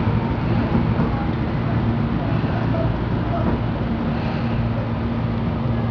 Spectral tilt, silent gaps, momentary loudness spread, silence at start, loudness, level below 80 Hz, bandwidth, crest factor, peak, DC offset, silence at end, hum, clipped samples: -10 dB/octave; none; 3 LU; 0 s; -22 LUFS; -30 dBFS; 5.4 kHz; 14 dB; -6 dBFS; under 0.1%; 0 s; none; under 0.1%